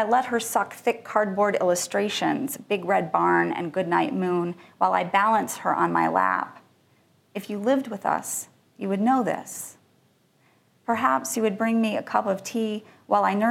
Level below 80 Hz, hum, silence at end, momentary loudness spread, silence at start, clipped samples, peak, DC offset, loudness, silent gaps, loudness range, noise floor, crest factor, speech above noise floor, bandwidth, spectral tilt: -76 dBFS; none; 0 s; 11 LU; 0 s; under 0.1%; -6 dBFS; under 0.1%; -24 LUFS; none; 4 LU; -63 dBFS; 18 dB; 39 dB; 16.5 kHz; -4.5 dB/octave